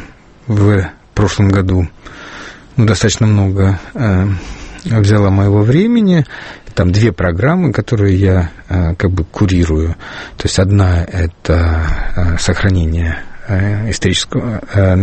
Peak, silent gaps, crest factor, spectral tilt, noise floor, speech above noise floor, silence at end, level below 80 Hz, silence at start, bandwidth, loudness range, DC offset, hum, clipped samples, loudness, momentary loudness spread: 0 dBFS; none; 12 dB; -6.5 dB/octave; -32 dBFS; 20 dB; 0 s; -26 dBFS; 0 s; 8.8 kHz; 3 LU; under 0.1%; none; under 0.1%; -13 LUFS; 11 LU